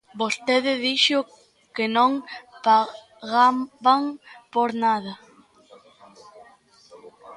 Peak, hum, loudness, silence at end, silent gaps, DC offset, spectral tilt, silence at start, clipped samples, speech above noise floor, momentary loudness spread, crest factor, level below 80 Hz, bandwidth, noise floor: -4 dBFS; none; -22 LUFS; 0 s; none; under 0.1%; -3 dB/octave; 0.15 s; under 0.1%; 32 dB; 19 LU; 20 dB; -74 dBFS; 11.5 kHz; -54 dBFS